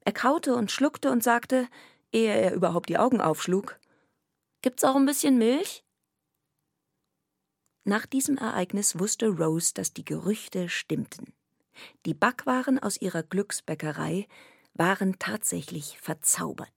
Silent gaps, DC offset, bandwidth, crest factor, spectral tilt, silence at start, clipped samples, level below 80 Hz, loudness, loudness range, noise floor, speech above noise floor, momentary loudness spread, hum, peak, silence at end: none; under 0.1%; 17.5 kHz; 22 dB; -4 dB/octave; 0.05 s; under 0.1%; -76 dBFS; -27 LUFS; 4 LU; -82 dBFS; 55 dB; 12 LU; none; -6 dBFS; 0.1 s